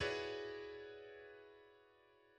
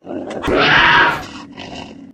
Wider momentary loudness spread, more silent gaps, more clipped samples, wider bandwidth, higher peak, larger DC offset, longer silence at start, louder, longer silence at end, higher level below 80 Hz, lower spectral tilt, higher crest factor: about the same, 24 LU vs 23 LU; neither; neither; second, 9.4 kHz vs 15.5 kHz; second, -30 dBFS vs 0 dBFS; neither; about the same, 0 s vs 0.05 s; second, -48 LUFS vs -12 LUFS; about the same, 0 s vs 0.1 s; second, -72 dBFS vs -38 dBFS; about the same, -4 dB/octave vs -4 dB/octave; about the same, 20 dB vs 16 dB